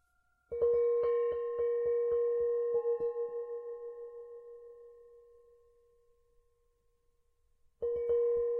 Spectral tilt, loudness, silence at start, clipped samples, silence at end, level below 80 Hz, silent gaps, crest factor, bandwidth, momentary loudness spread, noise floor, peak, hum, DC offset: -7.5 dB/octave; -33 LUFS; 0.5 s; under 0.1%; 0 s; -68 dBFS; none; 14 dB; 3.2 kHz; 19 LU; -74 dBFS; -22 dBFS; none; under 0.1%